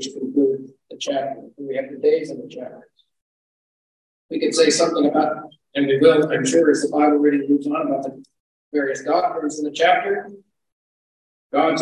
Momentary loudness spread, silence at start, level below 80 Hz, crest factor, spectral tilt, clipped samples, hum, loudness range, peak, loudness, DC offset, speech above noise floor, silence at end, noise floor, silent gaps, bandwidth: 15 LU; 0 s; -72 dBFS; 18 dB; -4 dB/octave; under 0.1%; none; 9 LU; -2 dBFS; -20 LUFS; under 0.1%; over 71 dB; 0 s; under -90 dBFS; 3.22-4.29 s, 8.40-8.71 s, 10.72-11.50 s; 11 kHz